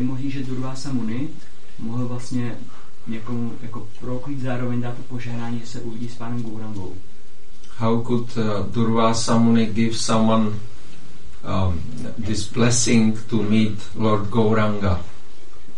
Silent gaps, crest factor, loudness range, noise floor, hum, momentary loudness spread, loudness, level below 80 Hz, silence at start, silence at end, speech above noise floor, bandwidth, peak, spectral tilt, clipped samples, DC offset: none; 18 dB; 9 LU; -48 dBFS; none; 15 LU; -23 LUFS; -48 dBFS; 0 s; 0.05 s; 25 dB; 11 kHz; -4 dBFS; -5.5 dB/octave; under 0.1%; 10%